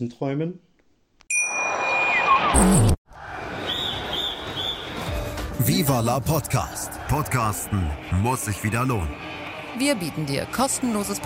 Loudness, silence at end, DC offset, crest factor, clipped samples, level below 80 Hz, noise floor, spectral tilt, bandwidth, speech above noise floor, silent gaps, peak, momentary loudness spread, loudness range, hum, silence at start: -23 LUFS; 0 s; under 0.1%; 20 dB; under 0.1%; -36 dBFS; -62 dBFS; -4 dB/octave; 16.5 kHz; 39 dB; 2.98-3.05 s; -4 dBFS; 13 LU; 4 LU; none; 0 s